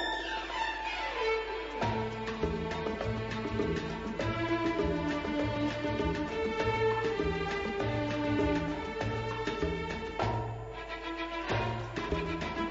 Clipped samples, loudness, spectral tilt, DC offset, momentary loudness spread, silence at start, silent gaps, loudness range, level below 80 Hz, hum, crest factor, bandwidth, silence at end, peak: under 0.1%; -33 LUFS; -4.5 dB/octave; under 0.1%; 6 LU; 0 s; none; 3 LU; -46 dBFS; none; 16 dB; 7.6 kHz; 0 s; -16 dBFS